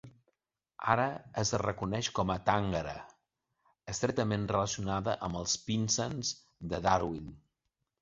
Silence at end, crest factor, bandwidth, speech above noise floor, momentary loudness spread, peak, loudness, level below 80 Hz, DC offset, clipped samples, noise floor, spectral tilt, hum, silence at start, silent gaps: 0.65 s; 24 dB; 7.8 kHz; 52 dB; 10 LU; -10 dBFS; -33 LUFS; -54 dBFS; under 0.1%; under 0.1%; -84 dBFS; -4.5 dB/octave; none; 0.05 s; none